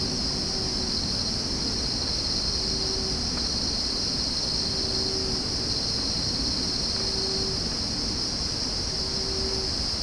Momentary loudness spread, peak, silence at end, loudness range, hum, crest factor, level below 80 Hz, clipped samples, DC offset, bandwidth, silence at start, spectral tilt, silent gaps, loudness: 2 LU; -12 dBFS; 0 s; 1 LU; none; 14 dB; -38 dBFS; under 0.1%; under 0.1%; 10.5 kHz; 0 s; -3 dB/octave; none; -25 LUFS